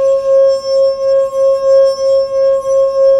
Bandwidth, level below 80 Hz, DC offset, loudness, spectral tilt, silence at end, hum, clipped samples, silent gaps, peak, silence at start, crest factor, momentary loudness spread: 9.2 kHz; -50 dBFS; under 0.1%; -11 LUFS; -3 dB/octave; 0 s; none; under 0.1%; none; -2 dBFS; 0 s; 8 dB; 3 LU